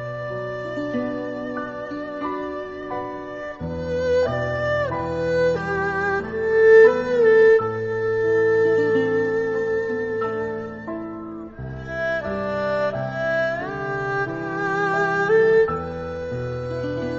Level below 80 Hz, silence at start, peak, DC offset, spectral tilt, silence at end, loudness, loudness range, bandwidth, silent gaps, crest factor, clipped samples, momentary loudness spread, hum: -50 dBFS; 0 s; -4 dBFS; under 0.1%; -7 dB/octave; 0 s; -22 LUFS; 9 LU; 7.2 kHz; none; 18 dB; under 0.1%; 14 LU; none